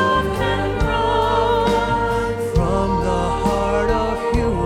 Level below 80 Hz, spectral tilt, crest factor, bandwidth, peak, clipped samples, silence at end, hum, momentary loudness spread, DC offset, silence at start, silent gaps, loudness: -28 dBFS; -6 dB/octave; 12 dB; 15.5 kHz; -6 dBFS; under 0.1%; 0 s; none; 3 LU; under 0.1%; 0 s; none; -19 LUFS